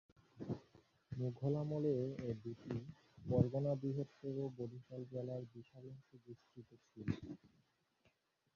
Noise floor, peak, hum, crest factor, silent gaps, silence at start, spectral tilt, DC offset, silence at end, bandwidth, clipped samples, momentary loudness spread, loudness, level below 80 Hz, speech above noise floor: -79 dBFS; -20 dBFS; none; 24 dB; none; 0.35 s; -9.5 dB/octave; under 0.1%; 1.1 s; 7 kHz; under 0.1%; 21 LU; -43 LUFS; -68 dBFS; 36 dB